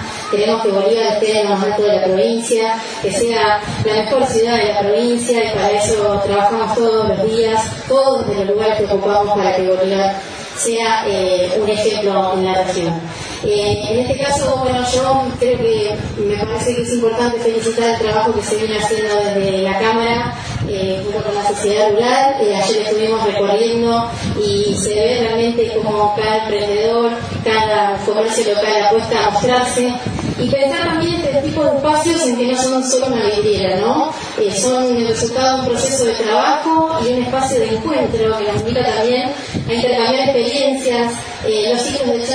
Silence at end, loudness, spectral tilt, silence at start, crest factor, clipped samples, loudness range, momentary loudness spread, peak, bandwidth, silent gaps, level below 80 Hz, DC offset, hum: 0 s; -15 LUFS; -4 dB/octave; 0 s; 14 dB; under 0.1%; 2 LU; 5 LU; -2 dBFS; 10.5 kHz; none; -42 dBFS; under 0.1%; none